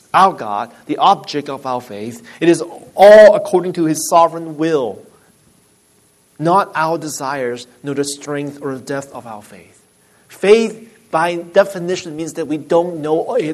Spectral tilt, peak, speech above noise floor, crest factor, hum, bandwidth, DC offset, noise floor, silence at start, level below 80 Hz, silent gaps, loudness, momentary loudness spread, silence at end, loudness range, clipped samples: -4.5 dB/octave; 0 dBFS; 39 dB; 16 dB; none; 13.5 kHz; under 0.1%; -54 dBFS; 0.15 s; -60 dBFS; none; -15 LUFS; 14 LU; 0 s; 9 LU; under 0.1%